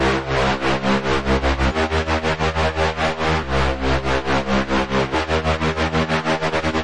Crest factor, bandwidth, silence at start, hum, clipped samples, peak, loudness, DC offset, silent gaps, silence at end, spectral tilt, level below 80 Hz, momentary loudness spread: 10 dB; 10.5 kHz; 0 s; none; under 0.1%; -8 dBFS; -20 LUFS; under 0.1%; none; 0 s; -5.5 dB/octave; -30 dBFS; 1 LU